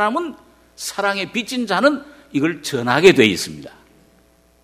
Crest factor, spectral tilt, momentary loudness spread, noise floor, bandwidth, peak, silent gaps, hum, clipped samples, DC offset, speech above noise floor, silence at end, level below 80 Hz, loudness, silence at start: 20 dB; -4 dB/octave; 16 LU; -55 dBFS; 15.5 kHz; 0 dBFS; none; none; under 0.1%; under 0.1%; 37 dB; 0.95 s; -56 dBFS; -18 LUFS; 0 s